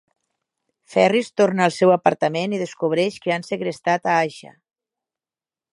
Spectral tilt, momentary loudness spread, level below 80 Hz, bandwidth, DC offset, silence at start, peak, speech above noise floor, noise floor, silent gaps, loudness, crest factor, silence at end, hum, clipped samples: -5.5 dB/octave; 8 LU; -70 dBFS; 11.5 kHz; under 0.1%; 0.9 s; 0 dBFS; over 70 dB; under -90 dBFS; none; -20 LUFS; 20 dB; 1.35 s; none; under 0.1%